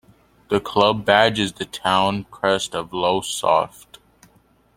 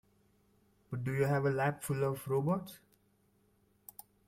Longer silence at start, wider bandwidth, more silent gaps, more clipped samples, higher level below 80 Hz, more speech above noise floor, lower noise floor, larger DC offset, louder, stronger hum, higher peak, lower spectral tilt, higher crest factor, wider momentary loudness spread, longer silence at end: second, 0.5 s vs 0.9 s; about the same, 16.5 kHz vs 16.5 kHz; neither; neither; first, -54 dBFS vs -68 dBFS; about the same, 37 dB vs 39 dB; second, -57 dBFS vs -72 dBFS; neither; first, -20 LUFS vs -34 LUFS; neither; first, 0 dBFS vs -18 dBFS; second, -4 dB/octave vs -7 dB/octave; about the same, 20 dB vs 18 dB; second, 9 LU vs 21 LU; second, 1.1 s vs 1.5 s